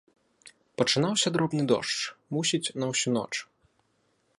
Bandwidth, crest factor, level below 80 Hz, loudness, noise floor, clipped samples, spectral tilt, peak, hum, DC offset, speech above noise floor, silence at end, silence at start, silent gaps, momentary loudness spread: 11.5 kHz; 20 dB; -70 dBFS; -27 LUFS; -71 dBFS; under 0.1%; -3.5 dB/octave; -8 dBFS; none; under 0.1%; 44 dB; 0.95 s; 0.45 s; none; 8 LU